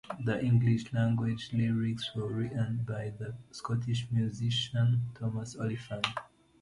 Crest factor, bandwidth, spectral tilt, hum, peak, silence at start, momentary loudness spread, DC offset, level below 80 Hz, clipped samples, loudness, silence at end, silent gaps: 20 dB; 11 kHz; -6.5 dB/octave; none; -10 dBFS; 0.05 s; 9 LU; under 0.1%; -60 dBFS; under 0.1%; -32 LUFS; 0.35 s; none